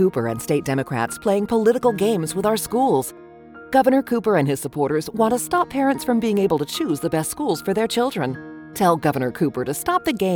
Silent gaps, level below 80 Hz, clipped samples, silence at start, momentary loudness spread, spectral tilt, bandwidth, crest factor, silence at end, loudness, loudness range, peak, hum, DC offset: none; -54 dBFS; under 0.1%; 0 s; 5 LU; -5.5 dB/octave; over 20 kHz; 16 dB; 0 s; -21 LUFS; 2 LU; -4 dBFS; none; under 0.1%